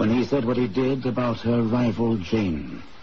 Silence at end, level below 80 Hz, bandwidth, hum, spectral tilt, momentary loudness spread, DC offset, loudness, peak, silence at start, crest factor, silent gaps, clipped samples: 0.15 s; -48 dBFS; 6.8 kHz; none; -8 dB/octave; 4 LU; 1%; -24 LUFS; -10 dBFS; 0 s; 12 dB; none; under 0.1%